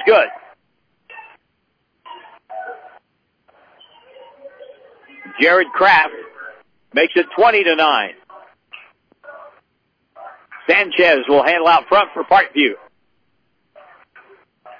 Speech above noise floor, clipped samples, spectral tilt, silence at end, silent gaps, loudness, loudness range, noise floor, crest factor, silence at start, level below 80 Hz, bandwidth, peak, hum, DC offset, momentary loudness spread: 54 dB; under 0.1%; -5 dB/octave; 2.05 s; none; -14 LUFS; 7 LU; -67 dBFS; 16 dB; 0 s; -60 dBFS; 5.4 kHz; -2 dBFS; none; under 0.1%; 23 LU